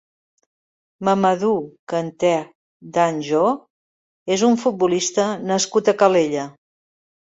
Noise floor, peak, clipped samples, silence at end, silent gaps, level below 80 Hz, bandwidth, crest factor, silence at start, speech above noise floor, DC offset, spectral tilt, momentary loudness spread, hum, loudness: under -90 dBFS; -2 dBFS; under 0.1%; 0.7 s; 1.79-1.87 s, 2.55-2.80 s, 3.70-4.26 s; -66 dBFS; 8 kHz; 18 dB; 1 s; over 71 dB; under 0.1%; -4.5 dB/octave; 10 LU; none; -20 LUFS